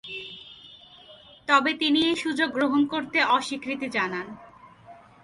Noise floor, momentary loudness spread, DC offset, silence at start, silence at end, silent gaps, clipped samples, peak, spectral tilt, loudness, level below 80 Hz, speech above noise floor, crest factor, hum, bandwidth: -50 dBFS; 19 LU; under 0.1%; 0.05 s; 0.25 s; none; under 0.1%; -8 dBFS; -3.5 dB/octave; -24 LUFS; -66 dBFS; 26 dB; 18 dB; none; 11.5 kHz